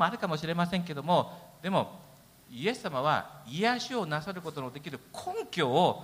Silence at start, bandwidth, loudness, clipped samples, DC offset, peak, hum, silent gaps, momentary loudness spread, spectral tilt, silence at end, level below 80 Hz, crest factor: 0 s; 16 kHz; -31 LUFS; under 0.1%; under 0.1%; -12 dBFS; none; none; 12 LU; -5.5 dB/octave; 0 s; -68 dBFS; 20 dB